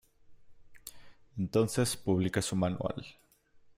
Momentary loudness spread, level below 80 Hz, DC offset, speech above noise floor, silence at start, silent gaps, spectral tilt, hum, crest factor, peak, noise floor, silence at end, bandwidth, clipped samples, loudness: 20 LU; -60 dBFS; under 0.1%; 30 dB; 0.3 s; none; -5.5 dB/octave; none; 18 dB; -16 dBFS; -61 dBFS; 0.65 s; 16 kHz; under 0.1%; -32 LUFS